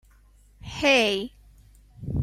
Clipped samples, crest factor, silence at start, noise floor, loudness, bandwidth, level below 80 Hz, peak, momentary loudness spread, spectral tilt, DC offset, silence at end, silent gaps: under 0.1%; 20 dB; 0.65 s; -56 dBFS; -22 LUFS; 14.5 kHz; -46 dBFS; -6 dBFS; 22 LU; -4 dB/octave; under 0.1%; 0 s; none